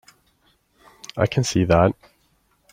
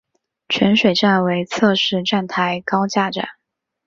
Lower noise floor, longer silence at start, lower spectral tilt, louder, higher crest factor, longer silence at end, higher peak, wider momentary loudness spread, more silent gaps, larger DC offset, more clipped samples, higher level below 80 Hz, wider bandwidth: second, -64 dBFS vs -78 dBFS; first, 1.15 s vs 0.5 s; about the same, -6 dB/octave vs -5 dB/octave; second, -20 LUFS vs -17 LUFS; first, 22 dB vs 16 dB; first, 0.8 s vs 0.55 s; about the same, -2 dBFS vs -2 dBFS; first, 20 LU vs 8 LU; neither; neither; neither; first, -46 dBFS vs -58 dBFS; first, 15.5 kHz vs 7.6 kHz